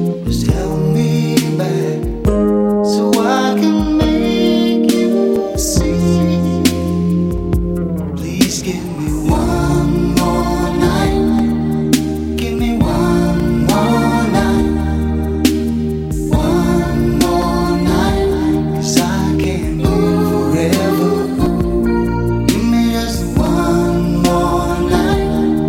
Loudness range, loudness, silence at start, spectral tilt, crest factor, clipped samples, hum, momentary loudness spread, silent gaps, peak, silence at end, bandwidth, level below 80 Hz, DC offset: 2 LU; -15 LUFS; 0 s; -6 dB/octave; 14 dB; under 0.1%; none; 4 LU; none; 0 dBFS; 0 s; 17 kHz; -24 dBFS; under 0.1%